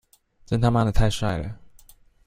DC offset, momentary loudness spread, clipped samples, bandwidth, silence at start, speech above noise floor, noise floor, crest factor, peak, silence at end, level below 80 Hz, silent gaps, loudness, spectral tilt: under 0.1%; 14 LU; under 0.1%; 15 kHz; 0.5 s; 32 dB; -52 dBFS; 18 dB; -6 dBFS; 0.7 s; -32 dBFS; none; -24 LUFS; -6.5 dB/octave